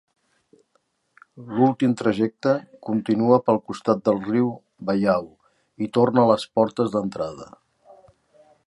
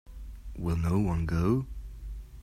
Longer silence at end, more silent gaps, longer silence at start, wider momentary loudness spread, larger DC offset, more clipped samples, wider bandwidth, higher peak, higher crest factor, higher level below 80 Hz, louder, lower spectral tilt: first, 1.2 s vs 0 s; neither; first, 1.35 s vs 0.05 s; second, 11 LU vs 17 LU; neither; neither; second, 11.5 kHz vs 13.5 kHz; first, -4 dBFS vs -14 dBFS; about the same, 20 dB vs 16 dB; second, -62 dBFS vs -40 dBFS; first, -22 LUFS vs -29 LUFS; about the same, -7.5 dB/octave vs -8.5 dB/octave